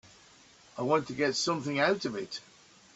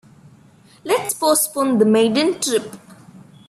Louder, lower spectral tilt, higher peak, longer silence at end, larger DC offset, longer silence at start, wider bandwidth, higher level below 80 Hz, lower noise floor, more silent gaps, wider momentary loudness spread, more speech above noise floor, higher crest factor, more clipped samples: second, -30 LUFS vs -17 LUFS; about the same, -4 dB/octave vs -3.5 dB/octave; second, -12 dBFS vs -4 dBFS; first, 0.55 s vs 0.3 s; neither; about the same, 0.75 s vs 0.85 s; second, 8.2 kHz vs 16 kHz; about the same, -70 dBFS vs -66 dBFS; first, -58 dBFS vs -48 dBFS; neither; first, 13 LU vs 8 LU; about the same, 28 dB vs 31 dB; about the same, 20 dB vs 16 dB; neither